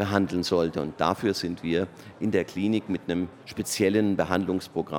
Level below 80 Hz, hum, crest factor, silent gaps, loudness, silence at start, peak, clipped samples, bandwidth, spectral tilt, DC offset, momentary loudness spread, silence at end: -56 dBFS; none; 22 dB; none; -27 LUFS; 0 s; -4 dBFS; under 0.1%; 17.5 kHz; -5.5 dB/octave; under 0.1%; 7 LU; 0 s